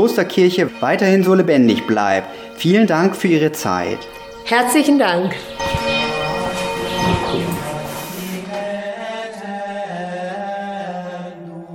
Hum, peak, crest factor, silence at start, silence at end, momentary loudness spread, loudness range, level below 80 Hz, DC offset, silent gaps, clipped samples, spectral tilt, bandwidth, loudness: none; -2 dBFS; 16 dB; 0 s; 0 s; 14 LU; 11 LU; -44 dBFS; under 0.1%; none; under 0.1%; -5 dB/octave; 18 kHz; -18 LUFS